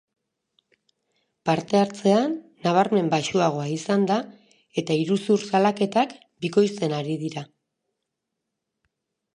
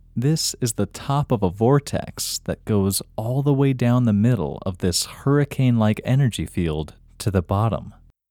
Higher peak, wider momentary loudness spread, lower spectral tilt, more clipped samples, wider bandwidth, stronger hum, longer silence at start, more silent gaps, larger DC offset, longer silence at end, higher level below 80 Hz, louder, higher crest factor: about the same, -4 dBFS vs -6 dBFS; about the same, 10 LU vs 8 LU; about the same, -6 dB/octave vs -6 dB/octave; neither; second, 10.5 kHz vs 17 kHz; neither; first, 1.45 s vs 0.15 s; neither; neither; first, 1.9 s vs 0.4 s; second, -70 dBFS vs -44 dBFS; about the same, -23 LUFS vs -22 LUFS; about the same, 20 dB vs 16 dB